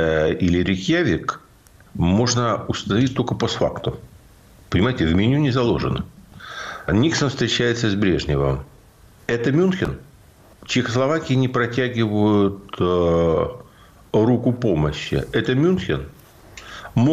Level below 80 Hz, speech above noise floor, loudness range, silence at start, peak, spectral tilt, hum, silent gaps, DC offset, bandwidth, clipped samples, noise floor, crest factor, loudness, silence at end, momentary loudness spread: -40 dBFS; 30 dB; 2 LU; 0 s; -8 dBFS; -6 dB/octave; none; none; under 0.1%; 14 kHz; under 0.1%; -50 dBFS; 12 dB; -20 LUFS; 0 s; 12 LU